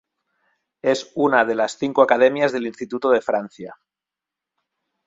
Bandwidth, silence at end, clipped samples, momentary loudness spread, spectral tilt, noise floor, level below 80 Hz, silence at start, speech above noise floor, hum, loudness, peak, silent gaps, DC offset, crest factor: 7.8 kHz; 1.35 s; under 0.1%; 12 LU; -4.5 dB/octave; -87 dBFS; -66 dBFS; 0.85 s; 68 dB; none; -20 LUFS; -2 dBFS; none; under 0.1%; 20 dB